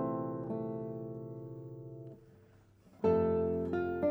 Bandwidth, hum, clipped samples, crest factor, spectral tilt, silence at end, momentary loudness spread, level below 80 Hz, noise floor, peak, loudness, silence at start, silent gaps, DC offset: over 20 kHz; none; under 0.1%; 18 dB; -10.5 dB/octave; 0 s; 18 LU; -66 dBFS; -62 dBFS; -18 dBFS; -35 LUFS; 0 s; none; under 0.1%